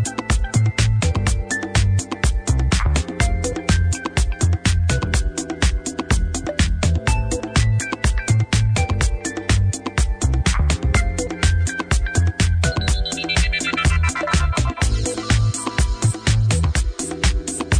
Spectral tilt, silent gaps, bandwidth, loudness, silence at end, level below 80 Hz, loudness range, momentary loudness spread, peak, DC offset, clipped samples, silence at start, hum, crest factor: -4.5 dB/octave; none; 10 kHz; -20 LUFS; 0 s; -22 dBFS; 1 LU; 4 LU; -6 dBFS; under 0.1%; under 0.1%; 0 s; none; 12 dB